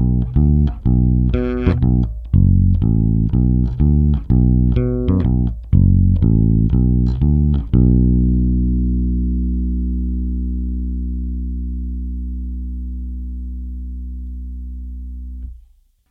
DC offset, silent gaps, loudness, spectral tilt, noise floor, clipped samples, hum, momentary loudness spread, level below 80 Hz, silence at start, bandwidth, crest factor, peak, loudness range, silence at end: under 0.1%; none; -17 LUFS; -12 dB/octave; -50 dBFS; under 0.1%; none; 16 LU; -20 dBFS; 0 s; 3.6 kHz; 16 dB; 0 dBFS; 13 LU; 0.55 s